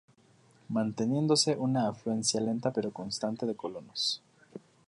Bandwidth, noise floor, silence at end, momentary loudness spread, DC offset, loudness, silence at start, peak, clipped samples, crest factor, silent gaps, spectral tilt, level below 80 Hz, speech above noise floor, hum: 11.5 kHz; -63 dBFS; 0.3 s; 13 LU; under 0.1%; -31 LUFS; 0.7 s; -12 dBFS; under 0.1%; 20 dB; none; -4.5 dB/octave; -72 dBFS; 32 dB; none